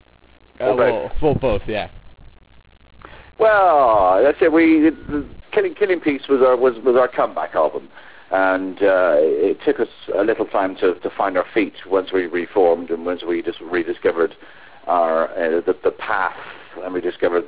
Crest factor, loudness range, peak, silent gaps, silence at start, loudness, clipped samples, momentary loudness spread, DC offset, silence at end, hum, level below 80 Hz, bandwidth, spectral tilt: 14 dB; 5 LU; -4 dBFS; none; 0.6 s; -18 LUFS; under 0.1%; 10 LU; 0.6%; 0 s; none; -44 dBFS; 4 kHz; -9.5 dB/octave